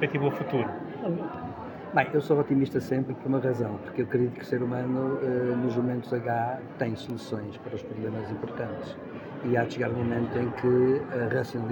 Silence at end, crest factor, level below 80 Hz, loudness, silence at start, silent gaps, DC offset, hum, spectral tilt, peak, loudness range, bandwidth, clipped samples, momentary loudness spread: 0 s; 20 dB; -64 dBFS; -29 LUFS; 0 s; none; under 0.1%; none; -8.5 dB/octave; -8 dBFS; 5 LU; 17 kHz; under 0.1%; 10 LU